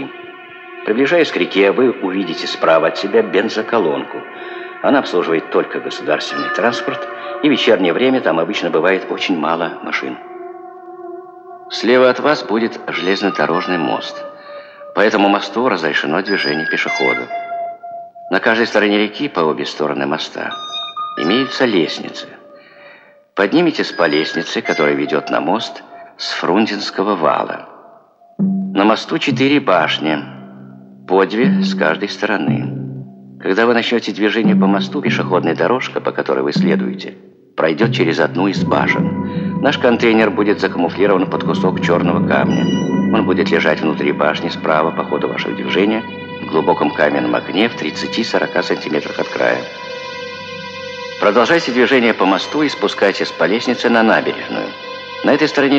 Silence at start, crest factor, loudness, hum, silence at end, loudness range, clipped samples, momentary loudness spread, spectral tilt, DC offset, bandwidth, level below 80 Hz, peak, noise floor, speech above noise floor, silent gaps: 0 s; 16 dB; -16 LUFS; none; 0 s; 3 LU; under 0.1%; 14 LU; -5.5 dB/octave; under 0.1%; 8.2 kHz; -66 dBFS; 0 dBFS; -46 dBFS; 31 dB; none